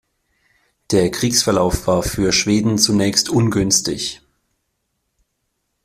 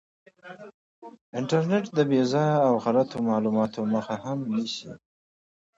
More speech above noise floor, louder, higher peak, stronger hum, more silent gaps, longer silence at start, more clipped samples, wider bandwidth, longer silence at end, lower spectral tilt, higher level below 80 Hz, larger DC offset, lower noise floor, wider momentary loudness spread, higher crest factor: second, 56 dB vs over 65 dB; first, -16 LUFS vs -25 LUFS; first, -2 dBFS vs -10 dBFS; neither; second, none vs 0.74-1.02 s, 1.21-1.33 s; first, 0.9 s vs 0.45 s; neither; first, 15.5 kHz vs 7.8 kHz; first, 1.7 s vs 0.8 s; second, -4 dB/octave vs -7 dB/octave; first, -38 dBFS vs -68 dBFS; neither; second, -72 dBFS vs under -90 dBFS; second, 5 LU vs 21 LU; about the same, 18 dB vs 18 dB